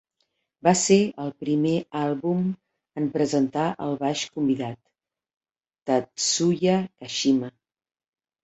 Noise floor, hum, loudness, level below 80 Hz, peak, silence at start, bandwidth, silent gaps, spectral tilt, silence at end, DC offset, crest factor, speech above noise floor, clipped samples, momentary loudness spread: -75 dBFS; none; -24 LUFS; -66 dBFS; -6 dBFS; 0.65 s; 8.2 kHz; 5.37-5.41 s, 5.82-5.86 s; -4.5 dB/octave; 0.95 s; under 0.1%; 20 dB; 51 dB; under 0.1%; 10 LU